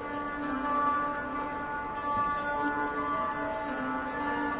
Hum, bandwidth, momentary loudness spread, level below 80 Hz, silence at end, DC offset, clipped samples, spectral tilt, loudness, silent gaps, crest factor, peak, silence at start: none; 4 kHz; 6 LU; -54 dBFS; 0 s; under 0.1%; under 0.1%; -3.5 dB/octave; -31 LUFS; none; 14 dB; -18 dBFS; 0 s